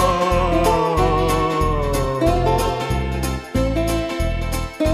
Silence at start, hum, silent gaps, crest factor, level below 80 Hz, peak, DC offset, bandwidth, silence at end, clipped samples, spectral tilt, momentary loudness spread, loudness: 0 s; none; none; 14 dB; -26 dBFS; -6 dBFS; under 0.1%; 15.5 kHz; 0 s; under 0.1%; -6 dB/octave; 6 LU; -20 LUFS